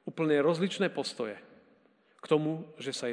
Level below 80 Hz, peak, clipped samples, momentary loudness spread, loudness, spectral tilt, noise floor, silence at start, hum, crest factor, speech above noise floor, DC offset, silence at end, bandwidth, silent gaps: under -90 dBFS; -12 dBFS; under 0.1%; 12 LU; -31 LUFS; -5.5 dB/octave; -65 dBFS; 0.05 s; none; 20 dB; 35 dB; under 0.1%; 0 s; 10 kHz; none